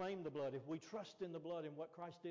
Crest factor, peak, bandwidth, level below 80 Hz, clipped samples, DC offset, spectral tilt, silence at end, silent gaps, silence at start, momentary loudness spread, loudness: 10 dB; -38 dBFS; 7.6 kHz; -88 dBFS; under 0.1%; under 0.1%; -6.5 dB/octave; 0 s; none; 0 s; 6 LU; -49 LUFS